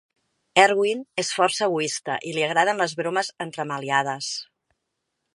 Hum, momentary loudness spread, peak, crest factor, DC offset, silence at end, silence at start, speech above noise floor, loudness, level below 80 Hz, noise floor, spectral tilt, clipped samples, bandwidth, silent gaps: none; 11 LU; 0 dBFS; 24 dB; under 0.1%; 0.9 s; 0.55 s; 56 dB; -23 LUFS; -74 dBFS; -79 dBFS; -3 dB/octave; under 0.1%; 11.5 kHz; none